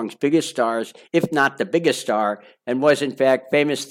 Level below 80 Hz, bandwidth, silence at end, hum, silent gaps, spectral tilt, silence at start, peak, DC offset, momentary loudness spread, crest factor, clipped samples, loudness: -70 dBFS; 16.5 kHz; 0 s; none; none; -4.5 dB/octave; 0 s; -4 dBFS; under 0.1%; 6 LU; 16 dB; under 0.1%; -20 LUFS